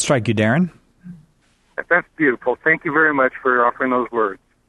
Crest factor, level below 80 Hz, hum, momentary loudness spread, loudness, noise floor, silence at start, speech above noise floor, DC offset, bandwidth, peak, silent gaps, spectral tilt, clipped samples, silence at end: 16 dB; -58 dBFS; none; 7 LU; -18 LUFS; -59 dBFS; 0 s; 41 dB; under 0.1%; 12 kHz; -2 dBFS; none; -5.5 dB/octave; under 0.1%; 0.35 s